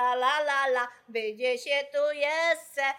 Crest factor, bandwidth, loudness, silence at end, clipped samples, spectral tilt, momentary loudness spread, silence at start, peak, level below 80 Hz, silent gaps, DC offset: 14 dB; 17 kHz; -27 LUFS; 0 s; under 0.1%; -0.5 dB/octave; 7 LU; 0 s; -14 dBFS; -86 dBFS; none; under 0.1%